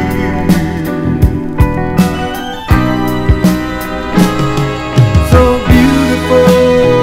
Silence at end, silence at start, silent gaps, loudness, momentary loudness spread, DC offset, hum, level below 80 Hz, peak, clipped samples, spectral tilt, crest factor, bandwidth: 0 s; 0 s; none; -11 LUFS; 8 LU; under 0.1%; none; -20 dBFS; 0 dBFS; 2%; -7 dB/octave; 10 dB; 16.5 kHz